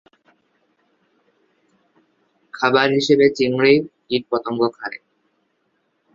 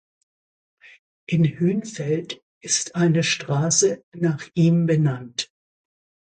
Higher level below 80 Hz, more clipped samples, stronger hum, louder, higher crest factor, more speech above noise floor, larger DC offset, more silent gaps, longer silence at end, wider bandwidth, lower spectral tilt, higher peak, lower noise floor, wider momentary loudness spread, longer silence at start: about the same, -62 dBFS vs -62 dBFS; neither; neither; first, -18 LUFS vs -22 LUFS; about the same, 20 dB vs 16 dB; second, 51 dB vs over 69 dB; neither; second, none vs 2.42-2.61 s, 4.03-4.12 s; first, 1.2 s vs 0.95 s; second, 7.6 kHz vs 9.4 kHz; about the same, -5.5 dB/octave vs -4.5 dB/octave; first, -2 dBFS vs -6 dBFS; second, -68 dBFS vs under -90 dBFS; first, 17 LU vs 11 LU; first, 2.55 s vs 1.3 s